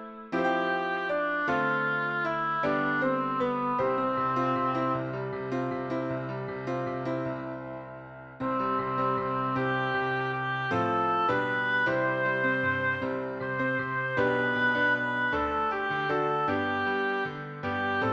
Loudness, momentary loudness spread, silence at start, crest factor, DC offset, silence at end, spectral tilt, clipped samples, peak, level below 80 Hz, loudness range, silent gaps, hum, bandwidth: -28 LUFS; 8 LU; 0 s; 14 dB; under 0.1%; 0 s; -7 dB/octave; under 0.1%; -14 dBFS; -60 dBFS; 5 LU; none; none; 7.8 kHz